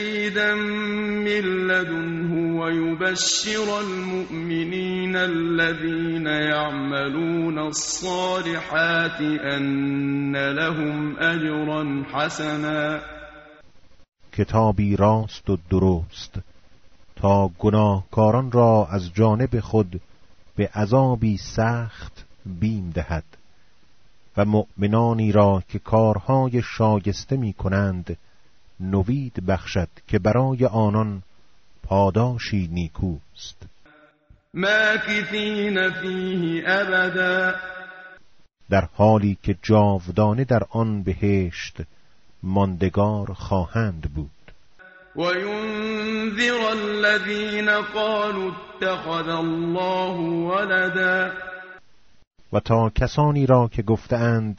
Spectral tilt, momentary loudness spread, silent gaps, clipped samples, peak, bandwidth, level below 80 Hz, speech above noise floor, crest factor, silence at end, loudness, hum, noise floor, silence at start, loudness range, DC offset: -5 dB/octave; 10 LU; 52.27-52.31 s; under 0.1%; -4 dBFS; 8 kHz; -42 dBFS; 38 dB; 18 dB; 0 s; -22 LUFS; none; -59 dBFS; 0 s; 5 LU; under 0.1%